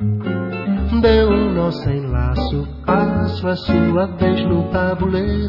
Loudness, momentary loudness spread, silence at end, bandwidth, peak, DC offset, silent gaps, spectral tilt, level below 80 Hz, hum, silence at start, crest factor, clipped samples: -18 LUFS; 8 LU; 0 s; 5.8 kHz; -2 dBFS; under 0.1%; none; -9.5 dB/octave; -28 dBFS; none; 0 s; 16 dB; under 0.1%